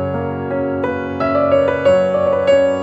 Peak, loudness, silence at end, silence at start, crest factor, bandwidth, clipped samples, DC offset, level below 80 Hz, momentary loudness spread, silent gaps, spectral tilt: -2 dBFS; -16 LUFS; 0 s; 0 s; 12 dB; 7.8 kHz; under 0.1%; under 0.1%; -48 dBFS; 7 LU; none; -7 dB/octave